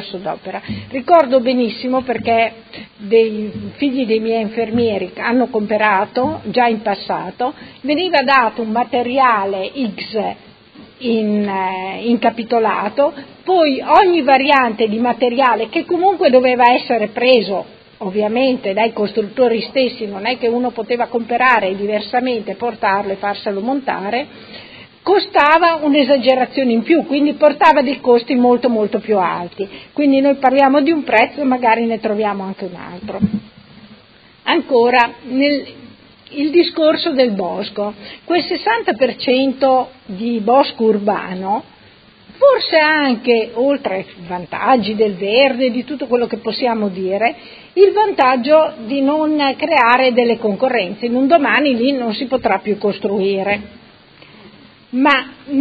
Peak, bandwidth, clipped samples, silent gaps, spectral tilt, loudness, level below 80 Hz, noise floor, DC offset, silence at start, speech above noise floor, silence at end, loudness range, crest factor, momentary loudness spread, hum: 0 dBFS; 6 kHz; under 0.1%; none; -7.5 dB/octave; -15 LUFS; -54 dBFS; -46 dBFS; under 0.1%; 0 s; 31 dB; 0 s; 5 LU; 16 dB; 11 LU; none